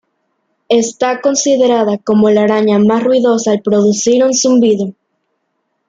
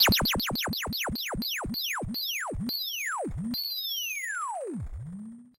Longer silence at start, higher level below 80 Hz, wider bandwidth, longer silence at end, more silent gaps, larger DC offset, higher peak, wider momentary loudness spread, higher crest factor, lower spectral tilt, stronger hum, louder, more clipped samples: first, 0.7 s vs 0 s; second, -58 dBFS vs -44 dBFS; second, 9.2 kHz vs 16 kHz; first, 0.95 s vs 0.1 s; neither; neither; first, -2 dBFS vs -12 dBFS; second, 4 LU vs 9 LU; second, 10 dB vs 20 dB; first, -4.5 dB/octave vs -2.5 dB/octave; neither; first, -11 LUFS vs -30 LUFS; neither